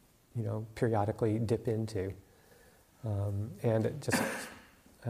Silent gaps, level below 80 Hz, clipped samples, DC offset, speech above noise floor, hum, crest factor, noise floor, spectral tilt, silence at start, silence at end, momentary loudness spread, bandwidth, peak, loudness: none; -62 dBFS; under 0.1%; under 0.1%; 29 dB; none; 18 dB; -62 dBFS; -6.5 dB/octave; 0.35 s; 0 s; 12 LU; 15.5 kHz; -16 dBFS; -34 LUFS